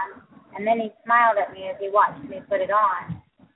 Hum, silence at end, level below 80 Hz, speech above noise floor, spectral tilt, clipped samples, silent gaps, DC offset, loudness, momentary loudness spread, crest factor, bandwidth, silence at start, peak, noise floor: none; 0.35 s; -64 dBFS; 23 dB; -9.5 dB/octave; under 0.1%; none; under 0.1%; -22 LUFS; 19 LU; 18 dB; 4.1 kHz; 0 s; -6 dBFS; -45 dBFS